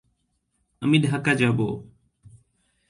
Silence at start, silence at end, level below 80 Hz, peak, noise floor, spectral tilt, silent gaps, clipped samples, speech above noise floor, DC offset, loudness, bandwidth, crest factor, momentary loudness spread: 0.8 s; 1.05 s; -58 dBFS; -6 dBFS; -72 dBFS; -6.5 dB/octave; none; under 0.1%; 51 dB; under 0.1%; -22 LUFS; 11.5 kHz; 20 dB; 9 LU